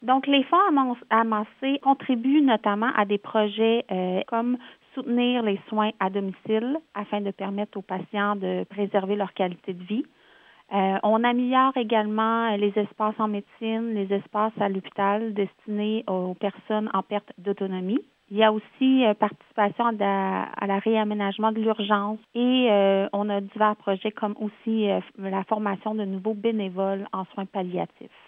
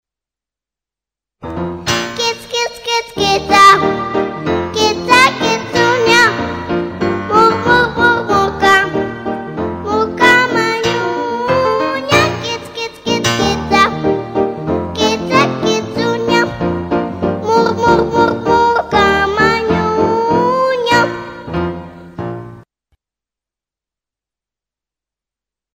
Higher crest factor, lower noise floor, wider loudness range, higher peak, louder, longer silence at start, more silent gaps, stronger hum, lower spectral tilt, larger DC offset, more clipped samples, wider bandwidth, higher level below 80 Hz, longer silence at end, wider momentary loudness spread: first, 20 dB vs 14 dB; second, -55 dBFS vs -88 dBFS; about the same, 5 LU vs 7 LU; second, -6 dBFS vs 0 dBFS; second, -25 LUFS vs -13 LUFS; second, 0 s vs 1.4 s; neither; neither; first, -9 dB/octave vs -4 dB/octave; neither; neither; second, 3.9 kHz vs 16.5 kHz; second, -80 dBFS vs -40 dBFS; second, 0.2 s vs 3.15 s; about the same, 10 LU vs 12 LU